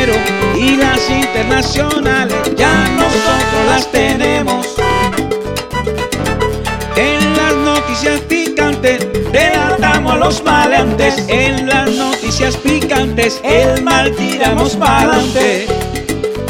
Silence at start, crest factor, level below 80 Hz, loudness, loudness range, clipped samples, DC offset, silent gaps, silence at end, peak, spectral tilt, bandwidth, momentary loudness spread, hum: 0 s; 12 dB; -26 dBFS; -12 LUFS; 3 LU; under 0.1%; 0.5%; none; 0 s; 0 dBFS; -4.5 dB/octave; 18 kHz; 6 LU; none